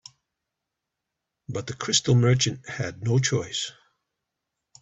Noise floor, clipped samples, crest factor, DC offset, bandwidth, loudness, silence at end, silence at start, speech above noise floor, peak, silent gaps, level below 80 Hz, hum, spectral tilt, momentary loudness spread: -84 dBFS; under 0.1%; 20 dB; under 0.1%; 8.2 kHz; -24 LUFS; 1.1 s; 1.5 s; 60 dB; -8 dBFS; none; -58 dBFS; none; -4 dB/octave; 14 LU